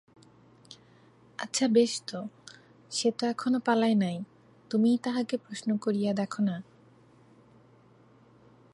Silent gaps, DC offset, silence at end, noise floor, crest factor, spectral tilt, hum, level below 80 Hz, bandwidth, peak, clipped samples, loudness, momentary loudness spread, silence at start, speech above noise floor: none; under 0.1%; 2.1 s; -59 dBFS; 18 dB; -5 dB/octave; none; -78 dBFS; 11.5 kHz; -12 dBFS; under 0.1%; -29 LUFS; 16 LU; 0.7 s; 31 dB